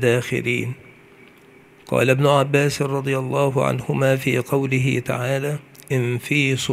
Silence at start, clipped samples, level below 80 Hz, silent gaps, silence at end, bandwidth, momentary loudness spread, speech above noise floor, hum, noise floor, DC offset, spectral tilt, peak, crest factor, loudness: 0 s; under 0.1%; -56 dBFS; none; 0 s; 15.5 kHz; 8 LU; 29 dB; none; -49 dBFS; under 0.1%; -5.5 dB/octave; -2 dBFS; 18 dB; -20 LUFS